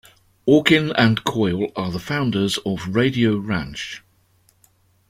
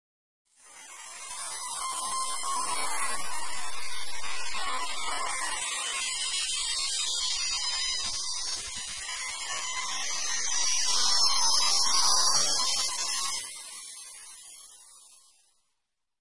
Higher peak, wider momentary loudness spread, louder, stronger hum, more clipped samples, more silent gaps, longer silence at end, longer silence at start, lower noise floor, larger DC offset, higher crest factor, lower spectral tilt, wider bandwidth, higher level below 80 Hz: first, -2 dBFS vs -10 dBFS; second, 12 LU vs 18 LU; first, -20 LUFS vs -27 LUFS; neither; neither; neither; first, 1.1 s vs 0 s; about the same, 0.45 s vs 0.45 s; second, -60 dBFS vs -83 dBFS; neither; about the same, 20 dB vs 20 dB; first, -5.5 dB/octave vs 2 dB/octave; first, 16 kHz vs 11.5 kHz; first, -50 dBFS vs -58 dBFS